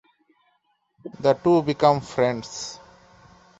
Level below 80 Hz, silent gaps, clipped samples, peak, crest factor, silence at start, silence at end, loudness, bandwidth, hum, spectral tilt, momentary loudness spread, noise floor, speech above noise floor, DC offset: -60 dBFS; none; under 0.1%; -2 dBFS; 22 dB; 1.05 s; 0.85 s; -22 LUFS; 8 kHz; none; -5.5 dB/octave; 24 LU; -69 dBFS; 47 dB; under 0.1%